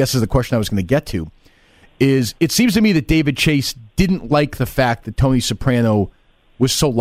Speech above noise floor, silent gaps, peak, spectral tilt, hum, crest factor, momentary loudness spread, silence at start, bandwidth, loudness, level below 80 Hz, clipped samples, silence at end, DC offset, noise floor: 34 dB; none; -4 dBFS; -5.5 dB/octave; none; 14 dB; 5 LU; 0 s; 16 kHz; -17 LUFS; -32 dBFS; under 0.1%; 0 s; under 0.1%; -50 dBFS